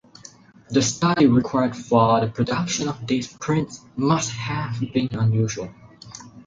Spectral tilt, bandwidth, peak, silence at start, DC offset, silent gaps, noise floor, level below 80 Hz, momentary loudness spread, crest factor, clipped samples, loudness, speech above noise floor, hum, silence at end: -5.5 dB/octave; 9.4 kHz; -4 dBFS; 0.7 s; under 0.1%; none; -47 dBFS; -52 dBFS; 12 LU; 18 dB; under 0.1%; -22 LUFS; 26 dB; none; 0.05 s